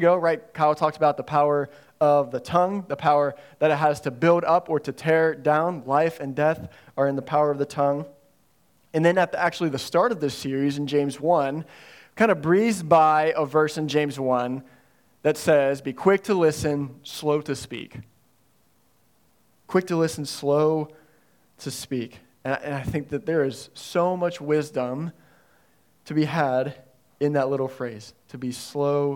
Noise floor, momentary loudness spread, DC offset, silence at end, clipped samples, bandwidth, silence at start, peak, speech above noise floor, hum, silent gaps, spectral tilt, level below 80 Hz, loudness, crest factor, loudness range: -65 dBFS; 13 LU; under 0.1%; 0 s; under 0.1%; 17.5 kHz; 0 s; -4 dBFS; 42 dB; none; none; -6 dB/octave; -62 dBFS; -23 LUFS; 20 dB; 6 LU